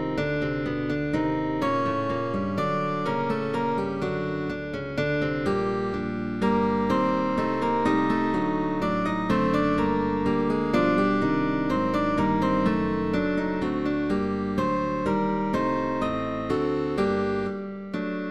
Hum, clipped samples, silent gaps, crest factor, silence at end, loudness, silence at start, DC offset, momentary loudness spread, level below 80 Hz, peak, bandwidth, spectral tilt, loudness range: none; under 0.1%; none; 16 dB; 0 s; -26 LUFS; 0 s; 0.5%; 5 LU; -48 dBFS; -10 dBFS; 11 kHz; -7.5 dB/octave; 3 LU